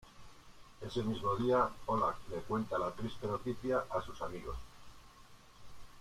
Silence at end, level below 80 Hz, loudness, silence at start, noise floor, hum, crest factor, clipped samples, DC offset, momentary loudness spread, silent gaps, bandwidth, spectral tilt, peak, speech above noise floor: 0 s; -56 dBFS; -37 LUFS; 0 s; -58 dBFS; none; 18 dB; under 0.1%; under 0.1%; 14 LU; none; 15.5 kHz; -6.5 dB/octave; -20 dBFS; 22 dB